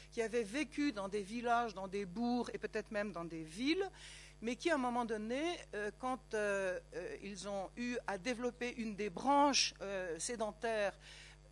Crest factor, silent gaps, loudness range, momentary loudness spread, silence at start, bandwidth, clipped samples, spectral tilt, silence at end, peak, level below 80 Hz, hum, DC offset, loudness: 20 dB; none; 4 LU; 11 LU; 0 s; 12 kHz; under 0.1%; -3 dB/octave; 0 s; -18 dBFS; -62 dBFS; none; under 0.1%; -39 LUFS